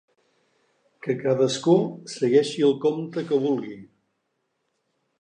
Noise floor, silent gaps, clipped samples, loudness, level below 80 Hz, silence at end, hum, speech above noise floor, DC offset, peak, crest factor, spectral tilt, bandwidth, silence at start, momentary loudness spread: -75 dBFS; none; under 0.1%; -23 LUFS; -78 dBFS; 1.35 s; none; 53 dB; under 0.1%; -6 dBFS; 18 dB; -6 dB/octave; 10 kHz; 1.05 s; 11 LU